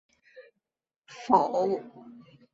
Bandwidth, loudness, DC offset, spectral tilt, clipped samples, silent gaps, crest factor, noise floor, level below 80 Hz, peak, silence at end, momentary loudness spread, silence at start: 7.8 kHz; -26 LUFS; under 0.1%; -6.5 dB/octave; under 0.1%; 0.96-1.02 s; 24 dB; -86 dBFS; -72 dBFS; -8 dBFS; 0.35 s; 24 LU; 0.35 s